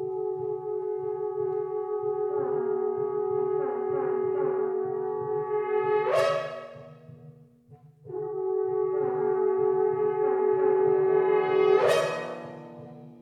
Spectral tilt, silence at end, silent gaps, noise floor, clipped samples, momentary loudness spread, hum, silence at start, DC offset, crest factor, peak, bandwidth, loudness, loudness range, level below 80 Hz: -6 dB/octave; 0.05 s; none; -54 dBFS; under 0.1%; 14 LU; none; 0 s; under 0.1%; 16 dB; -10 dBFS; 11.5 kHz; -27 LUFS; 6 LU; -76 dBFS